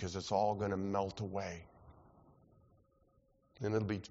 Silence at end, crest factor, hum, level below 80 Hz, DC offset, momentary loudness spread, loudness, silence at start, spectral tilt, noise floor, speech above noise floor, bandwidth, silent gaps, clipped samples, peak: 0.05 s; 18 dB; none; -66 dBFS; under 0.1%; 9 LU; -38 LUFS; 0 s; -6 dB/octave; -72 dBFS; 35 dB; 7.6 kHz; none; under 0.1%; -20 dBFS